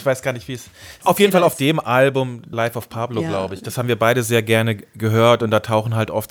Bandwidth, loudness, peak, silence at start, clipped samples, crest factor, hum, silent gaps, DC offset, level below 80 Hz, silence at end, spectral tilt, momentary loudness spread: over 20 kHz; -18 LUFS; -2 dBFS; 0 s; under 0.1%; 18 dB; none; none; under 0.1%; -56 dBFS; 0.05 s; -5.5 dB/octave; 11 LU